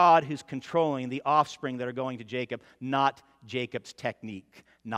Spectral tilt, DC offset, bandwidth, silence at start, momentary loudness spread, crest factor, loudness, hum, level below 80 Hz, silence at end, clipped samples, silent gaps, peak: -5.5 dB/octave; under 0.1%; 11.5 kHz; 0 s; 12 LU; 20 dB; -29 LUFS; none; -74 dBFS; 0 s; under 0.1%; none; -8 dBFS